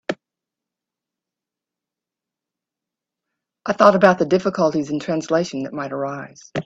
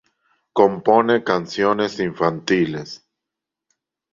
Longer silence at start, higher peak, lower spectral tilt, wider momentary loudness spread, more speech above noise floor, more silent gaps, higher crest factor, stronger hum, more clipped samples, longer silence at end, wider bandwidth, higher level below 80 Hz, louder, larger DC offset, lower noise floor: second, 0.1 s vs 0.55 s; about the same, 0 dBFS vs -2 dBFS; about the same, -6 dB/octave vs -6 dB/octave; first, 16 LU vs 12 LU; about the same, 68 dB vs 66 dB; neither; about the same, 22 dB vs 20 dB; neither; neither; second, 0.05 s vs 1.15 s; about the same, 8 kHz vs 7.6 kHz; about the same, -64 dBFS vs -60 dBFS; about the same, -19 LUFS vs -19 LUFS; neither; about the same, -87 dBFS vs -85 dBFS